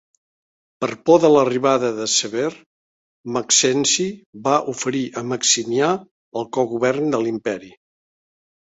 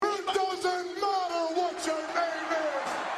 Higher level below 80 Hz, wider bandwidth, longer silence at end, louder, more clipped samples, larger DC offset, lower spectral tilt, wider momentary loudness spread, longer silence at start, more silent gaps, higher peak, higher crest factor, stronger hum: first, -64 dBFS vs -72 dBFS; second, 8.4 kHz vs 13.5 kHz; first, 1.05 s vs 0 s; first, -19 LUFS vs -30 LUFS; neither; neither; about the same, -3 dB/octave vs -2 dB/octave; first, 12 LU vs 2 LU; first, 0.8 s vs 0 s; first, 2.66-3.24 s, 4.26-4.33 s, 6.11-6.32 s vs none; first, -2 dBFS vs -16 dBFS; first, 20 dB vs 14 dB; neither